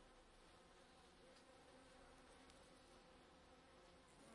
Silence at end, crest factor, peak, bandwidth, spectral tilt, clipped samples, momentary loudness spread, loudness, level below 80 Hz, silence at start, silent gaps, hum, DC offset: 0 s; 20 dB; -48 dBFS; 11 kHz; -3.5 dB/octave; under 0.1%; 2 LU; -67 LUFS; -76 dBFS; 0 s; none; none; under 0.1%